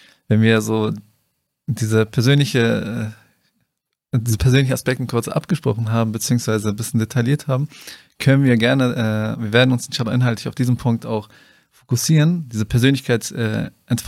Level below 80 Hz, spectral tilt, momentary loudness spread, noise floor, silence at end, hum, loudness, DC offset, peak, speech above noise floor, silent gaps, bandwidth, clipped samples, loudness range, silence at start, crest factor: -44 dBFS; -6 dB/octave; 9 LU; -74 dBFS; 0 s; none; -19 LUFS; under 0.1%; -2 dBFS; 56 dB; none; 15.5 kHz; under 0.1%; 3 LU; 0.3 s; 18 dB